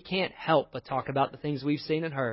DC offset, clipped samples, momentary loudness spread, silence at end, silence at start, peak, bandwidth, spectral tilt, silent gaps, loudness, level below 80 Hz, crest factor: under 0.1%; under 0.1%; 6 LU; 0 s; 0.05 s; -10 dBFS; 5.8 kHz; -10 dB/octave; none; -29 LUFS; -64 dBFS; 18 dB